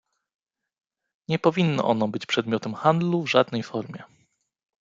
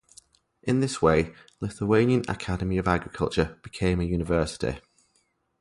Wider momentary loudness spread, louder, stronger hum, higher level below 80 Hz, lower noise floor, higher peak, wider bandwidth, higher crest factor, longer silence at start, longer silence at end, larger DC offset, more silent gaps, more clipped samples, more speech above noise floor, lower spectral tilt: about the same, 12 LU vs 12 LU; about the same, -24 LUFS vs -26 LUFS; neither; second, -68 dBFS vs -42 dBFS; about the same, -67 dBFS vs -70 dBFS; about the same, -4 dBFS vs -6 dBFS; second, 7.6 kHz vs 11.5 kHz; about the same, 22 dB vs 20 dB; first, 1.3 s vs 0.65 s; about the same, 0.75 s vs 0.8 s; neither; neither; neither; about the same, 44 dB vs 45 dB; about the same, -6.5 dB/octave vs -6.5 dB/octave